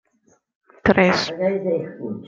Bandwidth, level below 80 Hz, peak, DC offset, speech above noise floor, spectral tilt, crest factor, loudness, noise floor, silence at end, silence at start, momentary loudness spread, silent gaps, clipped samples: 7.6 kHz; -50 dBFS; -2 dBFS; under 0.1%; 42 dB; -6 dB/octave; 20 dB; -20 LUFS; -62 dBFS; 0 s; 0.85 s; 9 LU; none; under 0.1%